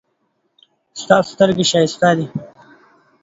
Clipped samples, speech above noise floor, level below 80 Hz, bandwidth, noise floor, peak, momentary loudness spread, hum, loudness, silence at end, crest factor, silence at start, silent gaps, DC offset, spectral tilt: under 0.1%; 52 dB; -58 dBFS; 8 kHz; -67 dBFS; 0 dBFS; 18 LU; none; -15 LUFS; 0.75 s; 18 dB; 0.95 s; none; under 0.1%; -4.5 dB/octave